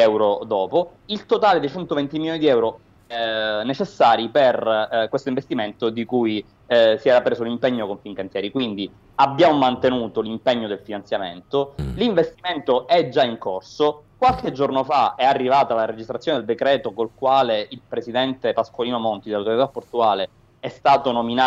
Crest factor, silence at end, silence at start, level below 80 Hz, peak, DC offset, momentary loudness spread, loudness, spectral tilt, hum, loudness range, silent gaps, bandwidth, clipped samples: 16 dB; 0 s; 0 s; -50 dBFS; -4 dBFS; under 0.1%; 10 LU; -21 LUFS; -6 dB/octave; none; 2 LU; none; 8 kHz; under 0.1%